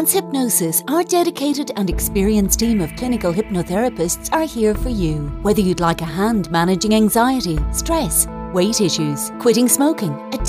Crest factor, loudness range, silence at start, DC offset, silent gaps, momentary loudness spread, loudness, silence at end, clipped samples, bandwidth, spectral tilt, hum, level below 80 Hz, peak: 18 dB; 2 LU; 0 s; under 0.1%; none; 6 LU; -18 LUFS; 0 s; under 0.1%; 16 kHz; -4.5 dB/octave; none; -30 dBFS; 0 dBFS